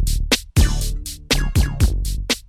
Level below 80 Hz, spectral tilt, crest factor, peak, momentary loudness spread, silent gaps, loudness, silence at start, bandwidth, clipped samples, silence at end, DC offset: -20 dBFS; -4 dB/octave; 16 dB; -2 dBFS; 7 LU; none; -20 LUFS; 0 s; 16 kHz; under 0.1%; 0.05 s; under 0.1%